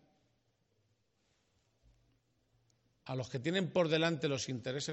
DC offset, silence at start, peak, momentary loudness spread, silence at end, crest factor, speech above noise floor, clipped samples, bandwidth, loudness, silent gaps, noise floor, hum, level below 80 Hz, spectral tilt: under 0.1%; 3.05 s; -18 dBFS; 10 LU; 0 s; 22 dB; 43 dB; under 0.1%; 8 kHz; -35 LUFS; none; -78 dBFS; none; -76 dBFS; -4.5 dB/octave